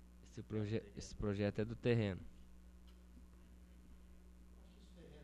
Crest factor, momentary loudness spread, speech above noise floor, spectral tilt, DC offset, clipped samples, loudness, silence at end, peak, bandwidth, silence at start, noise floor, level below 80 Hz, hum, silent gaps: 22 dB; 25 LU; 20 dB; -7 dB/octave; under 0.1%; under 0.1%; -41 LUFS; 0 s; -22 dBFS; 11.5 kHz; 0 s; -60 dBFS; -60 dBFS; none; none